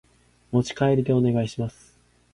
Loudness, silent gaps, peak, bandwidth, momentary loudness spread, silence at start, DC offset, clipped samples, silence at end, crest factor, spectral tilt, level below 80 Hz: -24 LUFS; none; -8 dBFS; 11 kHz; 10 LU; 0.5 s; under 0.1%; under 0.1%; 0.65 s; 16 dB; -7.5 dB/octave; -54 dBFS